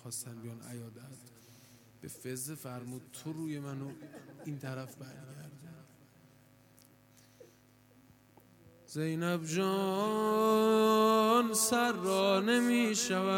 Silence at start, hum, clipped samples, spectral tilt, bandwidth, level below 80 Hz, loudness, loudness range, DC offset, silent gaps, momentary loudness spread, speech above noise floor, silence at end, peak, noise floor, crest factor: 0.05 s; none; under 0.1%; -4 dB/octave; 17.5 kHz; -78 dBFS; -31 LUFS; 20 LU; under 0.1%; none; 23 LU; 31 dB; 0 s; -14 dBFS; -63 dBFS; 20 dB